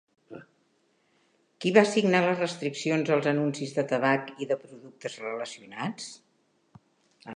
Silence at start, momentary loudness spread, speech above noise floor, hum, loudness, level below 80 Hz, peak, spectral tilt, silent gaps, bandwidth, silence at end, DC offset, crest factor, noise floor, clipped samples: 0.3 s; 18 LU; 43 dB; none; -27 LUFS; -80 dBFS; -6 dBFS; -5.5 dB/octave; none; 11 kHz; 0 s; under 0.1%; 24 dB; -69 dBFS; under 0.1%